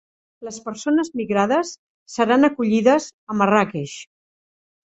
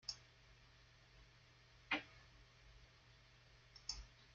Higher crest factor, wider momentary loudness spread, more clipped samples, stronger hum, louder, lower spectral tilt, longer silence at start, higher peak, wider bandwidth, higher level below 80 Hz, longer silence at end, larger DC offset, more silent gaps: second, 20 dB vs 28 dB; second, 16 LU vs 22 LU; neither; neither; first, -19 LUFS vs -48 LUFS; first, -5.5 dB/octave vs -1 dB/octave; first, 0.4 s vs 0 s; first, -2 dBFS vs -26 dBFS; about the same, 8.2 kHz vs 7.6 kHz; first, -62 dBFS vs -68 dBFS; first, 0.8 s vs 0 s; neither; first, 1.78-2.06 s, 3.13-3.27 s vs none